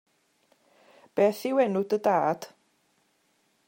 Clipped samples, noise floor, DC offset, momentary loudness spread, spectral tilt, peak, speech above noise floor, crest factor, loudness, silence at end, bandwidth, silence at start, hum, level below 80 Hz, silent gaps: under 0.1%; -70 dBFS; under 0.1%; 11 LU; -6 dB/octave; -12 dBFS; 45 dB; 18 dB; -26 LUFS; 1.2 s; 16.5 kHz; 1.15 s; none; -80 dBFS; none